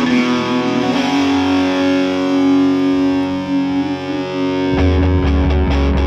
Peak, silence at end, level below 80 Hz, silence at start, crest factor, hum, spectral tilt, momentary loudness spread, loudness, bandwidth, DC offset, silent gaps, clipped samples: -4 dBFS; 0 s; -24 dBFS; 0 s; 10 dB; none; -6.5 dB/octave; 5 LU; -15 LUFS; 8 kHz; under 0.1%; none; under 0.1%